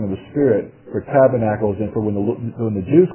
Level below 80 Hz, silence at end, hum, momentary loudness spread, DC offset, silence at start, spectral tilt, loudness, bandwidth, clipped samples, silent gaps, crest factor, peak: -46 dBFS; 0 s; none; 9 LU; under 0.1%; 0 s; -13 dB/octave; -19 LUFS; 3.2 kHz; under 0.1%; none; 16 dB; -2 dBFS